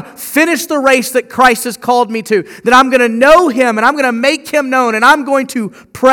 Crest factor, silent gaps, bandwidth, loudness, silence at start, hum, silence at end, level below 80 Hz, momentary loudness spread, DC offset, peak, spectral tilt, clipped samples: 10 dB; none; over 20 kHz; -11 LUFS; 0 s; none; 0 s; -46 dBFS; 9 LU; under 0.1%; 0 dBFS; -3 dB/octave; 0.9%